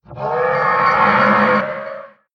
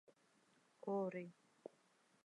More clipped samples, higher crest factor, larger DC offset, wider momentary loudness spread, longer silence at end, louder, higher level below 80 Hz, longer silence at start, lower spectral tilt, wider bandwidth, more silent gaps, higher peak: neither; about the same, 14 dB vs 18 dB; neither; second, 15 LU vs 18 LU; second, 0.3 s vs 0.9 s; first, -15 LUFS vs -46 LUFS; first, -52 dBFS vs under -90 dBFS; second, 0.1 s vs 0.85 s; about the same, -7 dB/octave vs -8 dB/octave; second, 7.4 kHz vs 11 kHz; neither; first, -2 dBFS vs -34 dBFS